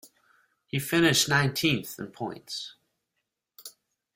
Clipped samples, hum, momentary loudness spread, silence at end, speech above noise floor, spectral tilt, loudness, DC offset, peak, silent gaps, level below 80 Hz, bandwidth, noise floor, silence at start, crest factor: under 0.1%; none; 24 LU; 0.45 s; 56 dB; -3.5 dB/octave; -26 LUFS; under 0.1%; -8 dBFS; none; -64 dBFS; 16.5 kHz; -82 dBFS; 0.05 s; 22 dB